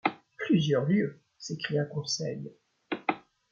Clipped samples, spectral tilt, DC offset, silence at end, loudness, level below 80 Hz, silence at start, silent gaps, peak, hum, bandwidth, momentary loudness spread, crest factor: under 0.1%; -5.5 dB/octave; under 0.1%; 0.35 s; -30 LUFS; -74 dBFS; 0.05 s; none; -12 dBFS; none; 7.6 kHz; 16 LU; 20 dB